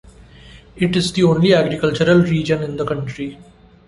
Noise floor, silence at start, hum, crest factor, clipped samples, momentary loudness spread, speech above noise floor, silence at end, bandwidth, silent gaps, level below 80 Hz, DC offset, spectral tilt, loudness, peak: -42 dBFS; 0.45 s; none; 16 dB; under 0.1%; 11 LU; 26 dB; 0.45 s; 11.5 kHz; none; -44 dBFS; under 0.1%; -6.5 dB/octave; -17 LUFS; -2 dBFS